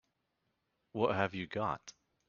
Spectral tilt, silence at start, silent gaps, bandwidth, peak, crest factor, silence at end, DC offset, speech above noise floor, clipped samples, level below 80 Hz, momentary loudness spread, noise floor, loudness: -4.5 dB/octave; 0.95 s; none; 7 kHz; -16 dBFS; 24 dB; 0.4 s; under 0.1%; 47 dB; under 0.1%; -70 dBFS; 13 LU; -82 dBFS; -36 LUFS